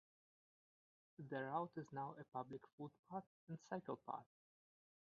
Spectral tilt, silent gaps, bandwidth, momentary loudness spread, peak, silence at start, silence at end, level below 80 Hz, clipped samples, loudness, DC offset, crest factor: -6.5 dB/octave; 2.73-2.78 s, 2.99-3.03 s, 3.27-3.47 s; 6 kHz; 11 LU; -30 dBFS; 1.2 s; 0.9 s; under -90 dBFS; under 0.1%; -51 LUFS; under 0.1%; 22 dB